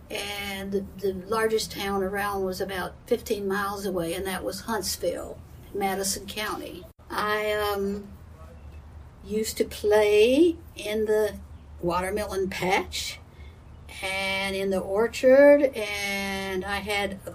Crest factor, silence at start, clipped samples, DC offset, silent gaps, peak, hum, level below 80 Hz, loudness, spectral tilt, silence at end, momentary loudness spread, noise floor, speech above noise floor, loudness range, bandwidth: 18 dB; 0 s; under 0.1%; under 0.1%; none; -8 dBFS; none; -48 dBFS; -26 LUFS; -4 dB/octave; 0 s; 17 LU; -46 dBFS; 20 dB; 7 LU; 15.5 kHz